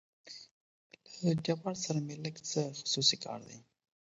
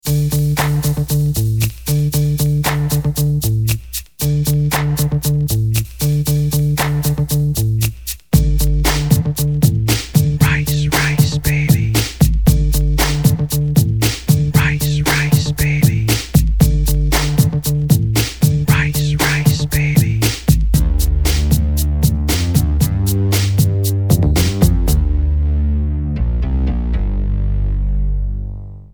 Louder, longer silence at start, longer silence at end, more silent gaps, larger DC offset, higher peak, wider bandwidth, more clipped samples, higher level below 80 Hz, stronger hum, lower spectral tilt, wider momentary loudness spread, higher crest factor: second, -34 LUFS vs -16 LUFS; first, 0.25 s vs 0.05 s; first, 0.5 s vs 0.05 s; first, 0.51-0.90 s vs none; second, under 0.1% vs 0.7%; second, -14 dBFS vs 0 dBFS; second, 8 kHz vs over 20 kHz; neither; second, -74 dBFS vs -20 dBFS; neither; about the same, -4.5 dB/octave vs -5.5 dB/octave; first, 22 LU vs 5 LU; first, 24 dB vs 14 dB